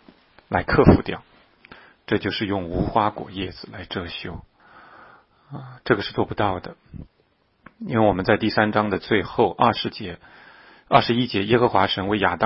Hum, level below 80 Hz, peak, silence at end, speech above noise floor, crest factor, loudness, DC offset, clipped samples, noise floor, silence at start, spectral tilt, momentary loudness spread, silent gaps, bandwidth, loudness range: none; -42 dBFS; -2 dBFS; 0 s; 43 dB; 20 dB; -22 LUFS; under 0.1%; under 0.1%; -64 dBFS; 0.5 s; -10.5 dB/octave; 20 LU; none; 5.8 kHz; 7 LU